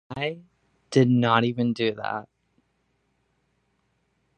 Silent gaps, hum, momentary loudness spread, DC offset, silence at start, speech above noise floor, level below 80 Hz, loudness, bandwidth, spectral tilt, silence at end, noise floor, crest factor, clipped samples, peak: none; none; 13 LU; under 0.1%; 0.1 s; 48 dB; -66 dBFS; -24 LUFS; 9.2 kHz; -7 dB/octave; 2.15 s; -71 dBFS; 24 dB; under 0.1%; -4 dBFS